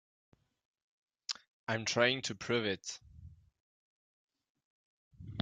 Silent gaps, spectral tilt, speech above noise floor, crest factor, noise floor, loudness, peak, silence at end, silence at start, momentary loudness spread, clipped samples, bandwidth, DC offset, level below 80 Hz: 1.47-1.67 s, 3.60-4.28 s, 4.49-4.55 s, 4.64-5.11 s; -3.5 dB/octave; 22 dB; 26 dB; -56 dBFS; -35 LUFS; -14 dBFS; 0 s; 1.3 s; 19 LU; under 0.1%; 9.6 kHz; under 0.1%; -70 dBFS